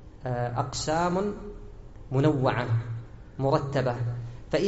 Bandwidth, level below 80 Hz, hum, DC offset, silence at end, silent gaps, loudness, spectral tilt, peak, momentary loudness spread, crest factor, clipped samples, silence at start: 8 kHz; -46 dBFS; none; under 0.1%; 0 s; none; -28 LUFS; -6 dB/octave; -10 dBFS; 18 LU; 18 dB; under 0.1%; 0 s